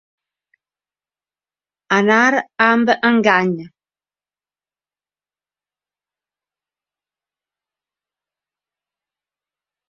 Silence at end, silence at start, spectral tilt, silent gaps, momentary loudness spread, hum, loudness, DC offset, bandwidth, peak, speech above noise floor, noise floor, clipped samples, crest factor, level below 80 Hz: 6.2 s; 1.9 s; -5 dB/octave; none; 6 LU; 50 Hz at -50 dBFS; -15 LUFS; under 0.1%; 7 kHz; 0 dBFS; over 75 dB; under -90 dBFS; under 0.1%; 22 dB; -68 dBFS